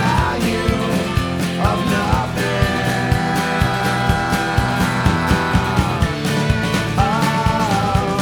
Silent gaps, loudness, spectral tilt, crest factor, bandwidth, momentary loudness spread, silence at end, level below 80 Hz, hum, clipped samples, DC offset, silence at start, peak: none; -18 LUFS; -5.5 dB/octave; 16 dB; over 20 kHz; 2 LU; 0 s; -28 dBFS; none; under 0.1%; under 0.1%; 0 s; 0 dBFS